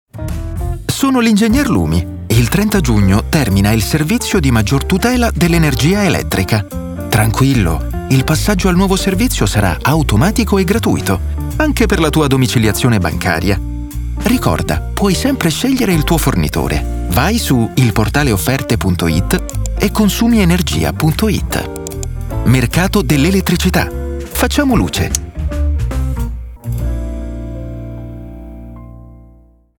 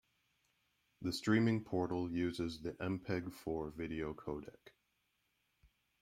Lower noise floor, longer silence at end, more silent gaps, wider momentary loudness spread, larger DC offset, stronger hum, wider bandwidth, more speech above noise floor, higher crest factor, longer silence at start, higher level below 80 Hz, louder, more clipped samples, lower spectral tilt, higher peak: second, -45 dBFS vs -82 dBFS; second, 0.55 s vs 1.35 s; neither; about the same, 11 LU vs 12 LU; neither; neither; first, 19.5 kHz vs 16 kHz; second, 32 dB vs 43 dB; second, 14 dB vs 20 dB; second, 0.15 s vs 1 s; first, -22 dBFS vs -66 dBFS; first, -14 LUFS vs -39 LUFS; neither; about the same, -5.5 dB/octave vs -6.5 dB/octave; first, 0 dBFS vs -20 dBFS